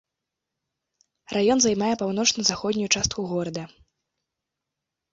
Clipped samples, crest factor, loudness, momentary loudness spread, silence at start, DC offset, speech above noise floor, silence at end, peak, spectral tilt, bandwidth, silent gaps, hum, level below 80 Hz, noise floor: under 0.1%; 24 dB; -23 LUFS; 11 LU; 1.3 s; under 0.1%; 61 dB; 1.45 s; -2 dBFS; -3 dB/octave; 8 kHz; none; none; -54 dBFS; -85 dBFS